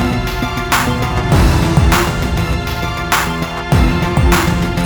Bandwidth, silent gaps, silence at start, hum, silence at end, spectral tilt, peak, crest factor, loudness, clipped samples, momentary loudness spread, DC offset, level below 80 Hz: over 20 kHz; none; 0 s; none; 0 s; -5 dB/octave; 0 dBFS; 14 dB; -14 LUFS; under 0.1%; 7 LU; under 0.1%; -20 dBFS